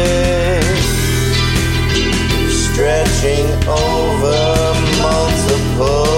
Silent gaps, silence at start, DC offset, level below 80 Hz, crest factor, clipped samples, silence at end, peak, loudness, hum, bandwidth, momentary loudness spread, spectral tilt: none; 0 s; under 0.1%; -20 dBFS; 12 dB; under 0.1%; 0 s; -2 dBFS; -14 LUFS; none; 16.5 kHz; 1 LU; -4.5 dB/octave